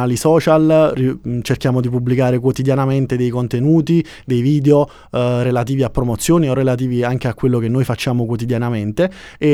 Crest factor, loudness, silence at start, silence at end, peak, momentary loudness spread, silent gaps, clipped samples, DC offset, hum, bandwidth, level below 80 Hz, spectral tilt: 14 dB; -16 LUFS; 0 s; 0 s; 0 dBFS; 7 LU; none; under 0.1%; under 0.1%; none; 15 kHz; -40 dBFS; -7 dB/octave